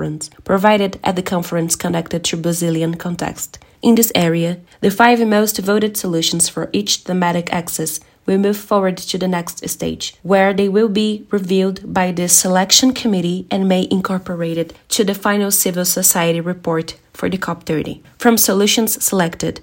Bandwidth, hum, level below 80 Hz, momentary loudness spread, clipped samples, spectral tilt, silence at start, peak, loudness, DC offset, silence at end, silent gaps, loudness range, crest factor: 16.5 kHz; none; -50 dBFS; 11 LU; under 0.1%; -3.5 dB/octave; 0 s; 0 dBFS; -16 LUFS; under 0.1%; 0 s; none; 3 LU; 16 dB